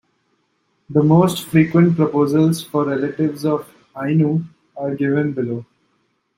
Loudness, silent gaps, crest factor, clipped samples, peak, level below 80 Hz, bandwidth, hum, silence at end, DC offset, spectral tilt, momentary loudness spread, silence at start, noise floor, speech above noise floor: -18 LUFS; none; 16 dB; under 0.1%; -2 dBFS; -58 dBFS; 16 kHz; none; 0.75 s; under 0.1%; -7.5 dB/octave; 12 LU; 0.9 s; -66 dBFS; 50 dB